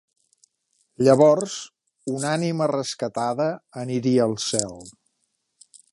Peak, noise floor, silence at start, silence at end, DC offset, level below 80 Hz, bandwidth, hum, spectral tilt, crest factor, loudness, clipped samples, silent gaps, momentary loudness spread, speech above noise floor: -2 dBFS; -74 dBFS; 1 s; 1.05 s; under 0.1%; -66 dBFS; 11.5 kHz; none; -5 dB/octave; 20 dB; -22 LUFS; under 0.1%; none; 18 LU; 52 dB